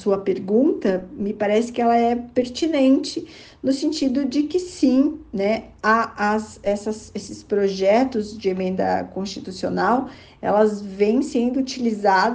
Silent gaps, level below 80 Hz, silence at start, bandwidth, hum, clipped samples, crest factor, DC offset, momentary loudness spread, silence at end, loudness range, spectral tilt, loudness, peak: none; -54 dBFS; 0 s; 9.4 kHz; none; under 0.1%; 16 dB; under 0.1%; 10 LU; 0 s; 2 LU; -5.5 dB/octave; -21 LUFS; -4 dBFS